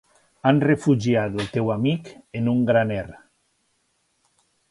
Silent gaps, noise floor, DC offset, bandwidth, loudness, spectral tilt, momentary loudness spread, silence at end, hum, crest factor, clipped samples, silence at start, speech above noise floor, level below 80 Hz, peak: none; -69 dBFS; under 0.1%; 11.5 kHz; -22 LUFS; -7.5 dB/octave; 11 LU; 1.55 s; none; 20 dB; under 0.1%; 0.45 s; 48 dB; -54 dBFS; -4 dBFS